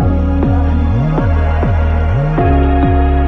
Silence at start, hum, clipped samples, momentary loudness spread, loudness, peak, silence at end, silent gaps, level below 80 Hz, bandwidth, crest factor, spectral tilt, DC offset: 0 s; none; under 0.1%; 2 LU; -13 LUFS; 0 dBFS; 0 s; none; -14 dBFS; 4.3 kHz; 10 dB; -10 dB/octave; under 0.1%